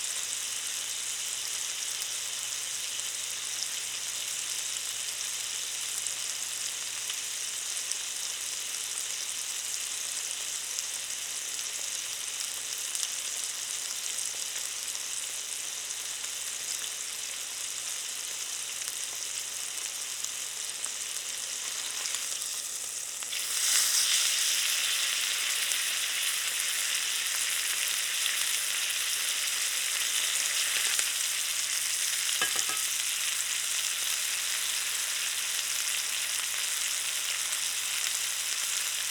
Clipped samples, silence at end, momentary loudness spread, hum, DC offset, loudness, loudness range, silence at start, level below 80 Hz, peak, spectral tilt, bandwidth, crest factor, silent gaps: under 0.1%; 0 s; 7 LU; 60 Hz at -70 dBFS; under 0.1%; -29 LUFS; 6 LU; 0 s; -76 dBFS; -6 dBFS; 3.5 dB/octave; over 20 kHz; 28 dB; none